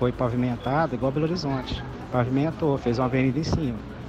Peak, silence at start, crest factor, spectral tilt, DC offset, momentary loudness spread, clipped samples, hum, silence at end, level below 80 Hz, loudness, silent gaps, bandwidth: -10 dBFS; 0 s; 14 dB; -7.5 dB/octave; under 0.1%; 6 LU; under 0.1%; none; 0 s; -42 dBFS; -25 LUFS; none; 8.2 kHz